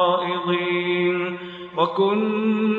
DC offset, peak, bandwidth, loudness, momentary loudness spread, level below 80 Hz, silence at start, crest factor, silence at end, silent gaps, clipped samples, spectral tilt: under 0.1%; -6 dBFS; 4.4 kHz; -22 LUFS; 8 LU; -70 dBFS; 0 s; 14 dB; 0 s; none; under 0.1%; -8 dB/octave